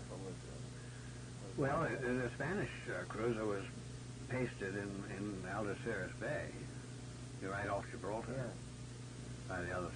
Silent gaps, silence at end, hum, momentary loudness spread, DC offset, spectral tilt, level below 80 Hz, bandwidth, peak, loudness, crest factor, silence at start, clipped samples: none; 0 s; none; 12 LU; under 0.1%; -6 dB/octave; -60 dBFS; 10.5 kHz; -26 dBFS; -43 LUFS; 16 dB; 0 s; under 0.1%